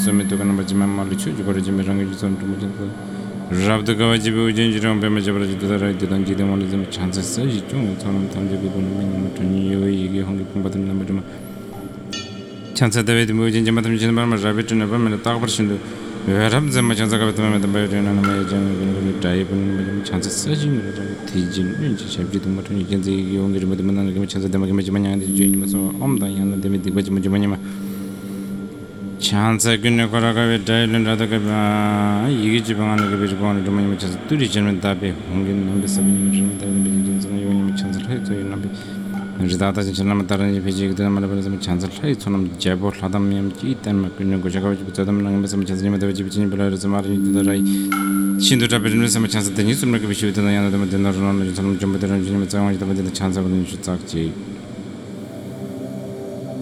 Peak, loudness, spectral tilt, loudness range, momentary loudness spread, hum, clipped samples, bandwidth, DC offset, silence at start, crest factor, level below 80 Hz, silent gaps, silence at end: -2 dBFS; -20 LUFS; -5.5 dB/octave; 4 LU; 10 LU; none; under 0.1%; 14.5 kHz; under 0.1%; 0 s; 18 dB; -48 dBFS; none; 0 s